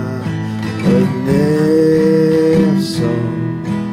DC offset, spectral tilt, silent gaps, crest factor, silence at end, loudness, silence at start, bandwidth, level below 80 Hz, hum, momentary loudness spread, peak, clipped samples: under 0.1%; -7.5 dB/octave; none; 10 dB; 0 s; -14 LUFS; 0 s; 15.5 kHz; -44 dBFS; none; 9 LU; -4 dBFS; under 0.1%